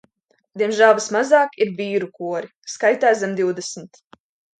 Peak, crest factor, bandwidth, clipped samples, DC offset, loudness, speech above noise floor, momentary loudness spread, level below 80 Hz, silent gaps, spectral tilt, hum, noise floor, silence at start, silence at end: -2 dBFS; 18 dB; 9.4 kHz; under 0.1%; under 0.1%; -19 LUFS; 43 dB; 15 LU; -72 dBFS; 2.55-2.62 s; -4 dB/octave; none; -62 dBFS; 0.55 s; 0.75 s